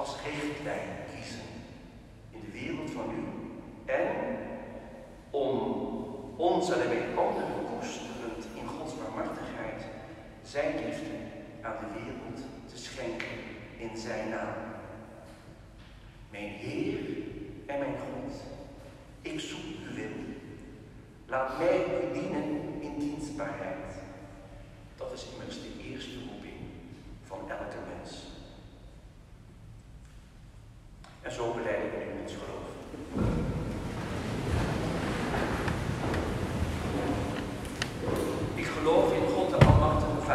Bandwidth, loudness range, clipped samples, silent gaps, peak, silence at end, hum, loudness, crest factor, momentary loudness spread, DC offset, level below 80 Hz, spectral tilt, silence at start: 14 kHz; 11 LU; under 0.1%; none; -4 dBFS; 0 s; none; -33 LUFS; 28 dB; 21 LU; under 0.1%; -46 dBFS; -6.5 dB/octave; 0 s